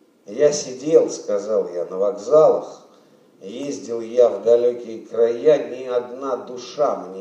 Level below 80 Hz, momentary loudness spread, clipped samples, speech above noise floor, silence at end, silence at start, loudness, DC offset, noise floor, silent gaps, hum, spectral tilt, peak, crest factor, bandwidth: -82 dBFS; 14 LU; under 0.1%; 33 dB; 0 s; 0.3 s; -20 LUFS; under 0.1%; -52 dBFS; none; none; -4.5 dB/octave; -2 dBFS; 18 dB; 8.6 kHz